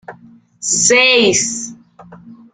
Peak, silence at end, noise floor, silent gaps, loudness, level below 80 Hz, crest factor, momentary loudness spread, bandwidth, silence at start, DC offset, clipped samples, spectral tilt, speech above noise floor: 0 dBFS; 0.2 s; -44 dBFS; none; -11 LUFS; -58 dBFS; 16 dB; 16 LU; 10 kHz; 0.1 s; under 0.1%; under 0.1%; -1 dB/octave; 31 dB